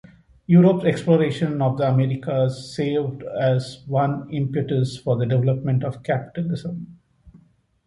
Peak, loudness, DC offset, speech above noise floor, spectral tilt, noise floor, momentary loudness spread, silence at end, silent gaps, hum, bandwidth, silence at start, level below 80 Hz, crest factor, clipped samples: -4 dBFS; -21 LUFS; under 0.1%; 36 dB; -8.5 dB/octave; -56 dBFS; 9 LU; 0.5 s; none; none; 11 kHz; 0.5 s; -56 dBFS; 18 dB; under 0.1%